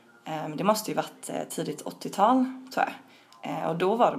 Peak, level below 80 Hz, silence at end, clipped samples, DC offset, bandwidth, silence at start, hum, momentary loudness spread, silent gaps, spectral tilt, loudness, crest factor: -8 dBFS; -80 dBFS; 0 s; under 0.1%; under 0.1%; 15.5 kHz; 0.25 s; none; 13 LU; none; -5 dB/octave; -28 LUFS; 20 dB